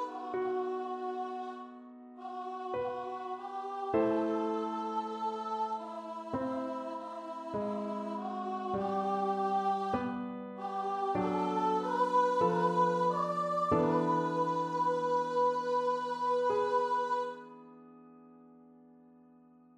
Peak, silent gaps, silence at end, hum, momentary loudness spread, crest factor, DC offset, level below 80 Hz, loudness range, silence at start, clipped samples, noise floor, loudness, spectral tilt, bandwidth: -16 dBFS; none; 1.05 s; none; 12 LU; 18 dB; under 0.1%; -70 dBFS; 8 LU; 0 s; under 0.1%; -60 dBFS; -33 LUFS; -7 dB/octave; 10.5 kHz